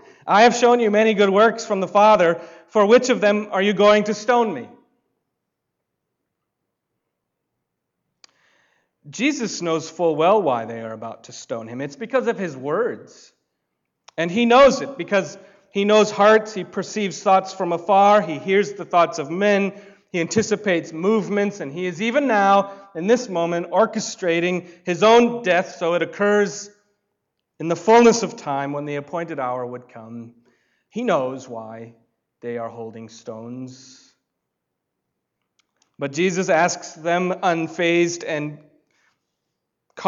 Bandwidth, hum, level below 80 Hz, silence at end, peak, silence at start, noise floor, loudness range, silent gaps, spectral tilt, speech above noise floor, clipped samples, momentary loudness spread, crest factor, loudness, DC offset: 7.8 kHz; none; -64 dBFS; 0 s; -4 dBFS; 0.25 s; -79 dBFS; 12 LU; none; -4.5 dB/octave; 60 dB; under 0.1%; 19 LU; 16 dB; -19 LUFS; under 0.1%